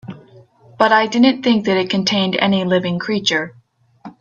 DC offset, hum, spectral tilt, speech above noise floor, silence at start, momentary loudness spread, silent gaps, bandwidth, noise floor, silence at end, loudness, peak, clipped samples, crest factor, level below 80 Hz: under 0.1%; none; -5 dB/octave; 30 dB; 0.05 s; 7 LU; none; 7.6 kHz; -46 dBFS; 0.1 s; -16 LUFS; 0 dBFS; under 0.1%; 18 dB; -58 dBFS